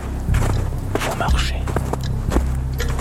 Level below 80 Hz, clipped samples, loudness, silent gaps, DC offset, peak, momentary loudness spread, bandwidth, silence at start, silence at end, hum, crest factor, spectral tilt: -22 dBFS; under 0.1%; -22 LUFS; none; under 0.1%; -4 dBFS; 4 LU; 16 kHz; 0 s; 0 s; none; 16 dB; -5.5 dB/octave